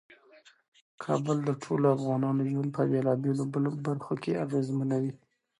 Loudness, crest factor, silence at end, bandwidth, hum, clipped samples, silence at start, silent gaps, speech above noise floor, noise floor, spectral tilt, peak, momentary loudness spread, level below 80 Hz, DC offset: -30 LUFS; 18 dB; 0.45 s; 11 kHz; none; under 0.1%; 1 s; none; 31 dB; -59 dBFS; -8.5 dB/octave; -12 dBFS; 6 LU; -74 dBFS; under 0.1%